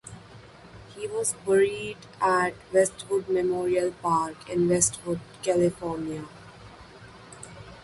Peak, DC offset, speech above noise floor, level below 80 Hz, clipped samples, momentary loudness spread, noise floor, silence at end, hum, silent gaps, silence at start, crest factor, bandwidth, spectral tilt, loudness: -8 dBFS; under 0.1%; 22 dB; -58 dBFS; under 0.1%; 24 LU; -48 dBFS; 0 s; none; none; 0.05 s; 20 dB; 11.5 kHz; -4.5 dB/octave; -26 LUFS